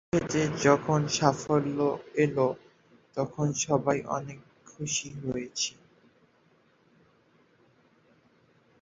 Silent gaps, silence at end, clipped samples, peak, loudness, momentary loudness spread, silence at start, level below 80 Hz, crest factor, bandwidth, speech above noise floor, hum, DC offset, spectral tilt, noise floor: none; 3.1 s; under 0.1%; -6 dBFS; -28 LUFS; 10 LU; 0.15 s; -62 dBFS; 24 dB; 7.8 kHz; 37 dB; none; under 0.1%; -4.5 dB/octave; -65 dBFS